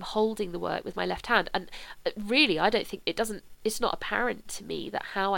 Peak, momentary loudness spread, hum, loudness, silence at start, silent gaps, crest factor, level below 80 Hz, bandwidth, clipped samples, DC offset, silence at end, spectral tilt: -8 dBFS; 12 LU; none; -29 LUFS; 0 s; none; 20 dB; -50 dBFS; 18.5 kHz; under 0.1%; under 0.1%; 0 s; -3.5 dB/octave